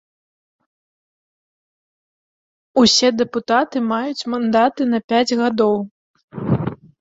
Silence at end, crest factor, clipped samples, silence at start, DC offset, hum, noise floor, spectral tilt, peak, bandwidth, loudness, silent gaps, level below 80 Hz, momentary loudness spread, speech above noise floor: 0.25 s; 18 dB; under 0.1%; 2.75 s; under 0.1%; none; under -90 dBFS; -4.5 dB/octave; -2 dBFS; 7.8 kHz; -18 LUFS; 5.04-5.08 s, 5.91-6.14 s, 6.23-6.28 s; -52 dBFS; 10 LU; over 73 dB